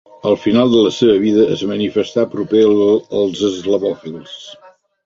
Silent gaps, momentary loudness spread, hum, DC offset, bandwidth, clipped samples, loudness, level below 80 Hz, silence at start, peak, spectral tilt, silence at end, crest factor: none; 14 LU; none; under 0.1%; 7.6 kHz; under 0.1%; -15 LUFS; -54 dBFS; 0.25 s; -2 dBFS; -6 dB/octave; 0.5 s; 14 dB